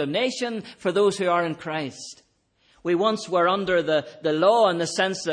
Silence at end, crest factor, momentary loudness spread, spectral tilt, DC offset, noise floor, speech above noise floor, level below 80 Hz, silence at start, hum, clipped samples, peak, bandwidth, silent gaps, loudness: 0 s; 16 dB; 10 LU; -4.5 dB/octave; under 0.1%; -64 dBFS; 41 dB; -64 dBFS; 0 s; none; under 0.1%; -6 dBFS; 10.5 kHz; none; -23 LUFS